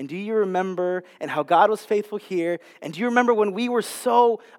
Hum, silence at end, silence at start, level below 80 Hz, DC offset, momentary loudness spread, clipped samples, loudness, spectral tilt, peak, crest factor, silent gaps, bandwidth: none; 0.2 s; 0 s; -90 dBFS; under 0.1%; 10 LU; under 0.1%; -22 LUFS; -5 dB/octave; -2 dBFS; 20 dB; none; 17 kHz